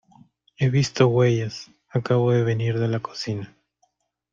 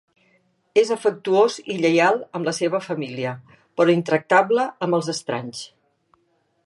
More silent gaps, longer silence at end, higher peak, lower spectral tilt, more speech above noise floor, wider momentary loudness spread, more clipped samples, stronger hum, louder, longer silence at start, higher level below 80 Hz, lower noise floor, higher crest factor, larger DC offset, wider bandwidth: neither; second, 0.85 s vs 1 s; about the same, -2 dBFS vs -2 dBFS; first, -6.5 dB/octave vs -5 dB/octave; about the same, 48 dB vs 46 dB; about the same, 13 LU vs 12 LU; neither; neither; about the same, -22 LUFS vs -21 LUFS; second, 0.6 s vs 0.75 s; first, -58 dBFS vs -74 dBFS; about the same, -69 dBFS vs -67 dBFS; about the same, 20 dB vs 20 dB; neither; second, 7.6 kHz vs 11.5 kHz